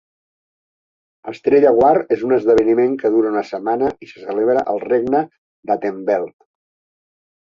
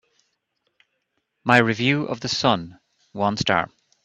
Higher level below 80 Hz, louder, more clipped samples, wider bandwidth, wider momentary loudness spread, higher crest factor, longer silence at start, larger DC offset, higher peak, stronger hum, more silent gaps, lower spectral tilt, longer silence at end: about the same, -56 dBFS vs -58 dBFS; first, -17 LUFS vs -21 LUFS; neither; second, 7.2 kHz vs 10.5 kHz; about the same, 16 LU vs 15 LU; second, 16 dB vs 24 dB; second, 1.25 s vs 1.45 s; neither; about the same, -2 dBFS vs 0 dBFS; neither; first, 5.38-5.63 s vs none; first, -7.5 dB/octave vs -4.5 dB/octave; first, 1.1 s vs 0.4 s